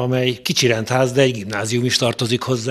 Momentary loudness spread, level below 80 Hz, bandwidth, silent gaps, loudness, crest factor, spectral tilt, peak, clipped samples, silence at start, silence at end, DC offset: 4 LU; -56 dBFS; 14.5 kHz; none; -18 LUFS; 18 dB; -4.5 dB/octave; 0 dBFS; under 0.1%; 0 s; 0 s; under 0.1%